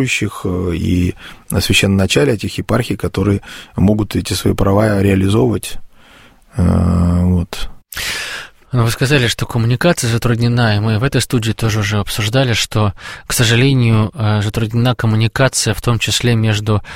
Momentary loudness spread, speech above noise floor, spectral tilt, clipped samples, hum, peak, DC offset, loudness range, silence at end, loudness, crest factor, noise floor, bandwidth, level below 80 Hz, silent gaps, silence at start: 8 LU; 30 dB; -5 dB/octave; under 0.1%; none; 0 dBFS; under 0.1%; 2 LU; 0 s; -15 LUFS; 14 dB; -44 dBFS; 16.5 kHz; -32 dBFS; none; 0 s